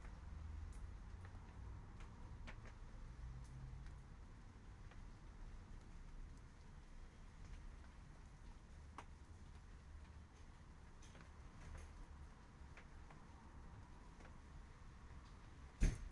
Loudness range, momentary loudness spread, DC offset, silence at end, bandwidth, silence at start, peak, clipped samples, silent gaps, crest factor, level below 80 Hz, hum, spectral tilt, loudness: 4 LU; 6 LU; under 0.1%; 0 s; 11 kHz; 0 s; -24 dBFS; under 0.1%; none; 28 dB; -54 dBFS; none; -5.5 dB/octave; -58 LUFS